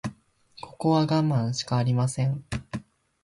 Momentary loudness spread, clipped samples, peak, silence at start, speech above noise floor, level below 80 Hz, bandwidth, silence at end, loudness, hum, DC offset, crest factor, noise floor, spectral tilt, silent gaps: 16 LU; under 0.1%; -12 dBFS; 0.05 s; 30 dB; -52 dBFS; 11.5 kHz; 0.45 s; -26 LUFS; none; under 0.1%; 14 dB; -54 dBFS; -6.5 dB/octave; none